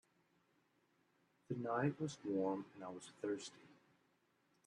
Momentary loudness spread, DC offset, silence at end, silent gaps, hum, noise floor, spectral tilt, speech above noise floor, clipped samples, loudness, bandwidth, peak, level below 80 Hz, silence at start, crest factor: 13 LU; under 0.1%; 0.95 s; none; none; -79 dBFS; -6 dB/octave; 36 dB; under 0.1%; -43 LUFS; 11 kHz; -26 dBFS; -88 dBFS; 1.5 s; 20 dB